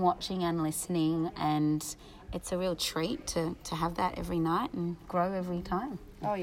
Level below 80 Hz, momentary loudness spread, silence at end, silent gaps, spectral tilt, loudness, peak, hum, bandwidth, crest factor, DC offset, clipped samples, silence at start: -52 dBFS; 7 LU; 0 s; none; -5 dB/octave; -32 LUFS; -14 dBFS; none; 16 kHz; 18 dB; under 0.1%; under 0.1%; 0 s